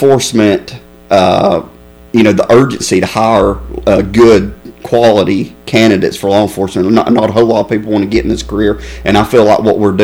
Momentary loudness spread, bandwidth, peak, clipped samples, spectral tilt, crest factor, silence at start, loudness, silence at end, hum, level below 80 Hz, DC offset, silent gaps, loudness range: 7 LU; over 20 kHz; 0 dBFS; 0.3%; -5.5 dB/octave; 10 dB; 0 s; -10 LUFS; 0 s; none; -30 dBFS; under 0.1%; none; 1 LU